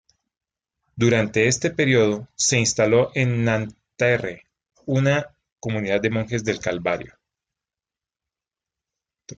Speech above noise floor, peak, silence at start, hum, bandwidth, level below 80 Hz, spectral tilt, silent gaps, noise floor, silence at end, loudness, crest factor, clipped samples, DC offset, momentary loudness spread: over 69 dB; -6 dBFS; 0.95 s; none; 9.6 kHz; -56 dBFS; -4.5 dB/octave; 5.52-5.56 s; under -90 dBFS; 0.05 s; -21 LUFS; 18 dB; under 0.1%; under 0.1%; 10 LU